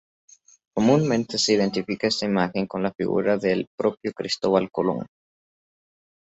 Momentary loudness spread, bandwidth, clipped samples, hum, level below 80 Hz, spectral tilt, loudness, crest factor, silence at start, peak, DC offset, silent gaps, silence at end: 7 LU; 8.2 kHz; under 0.1%; none; -60 dBFS; -5 dB/octave; -23 LUFS; 20 dB; 0.75 s; -4 dBFS; under 0.1%; 2.95-2.99 s, 3.67-3.78 s; 1.15 s